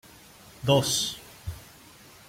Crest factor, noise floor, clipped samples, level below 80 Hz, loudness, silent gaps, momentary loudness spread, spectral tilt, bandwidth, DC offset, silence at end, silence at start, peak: 22 dB; -51 dBFS; under 0.1%; -52 dBFS; -25 LUFS; none; 19 LU; -3.5 dB/octave; 16.5 kHz; under 0.1%; 0.65 s; 0.6 s; -8 dBFS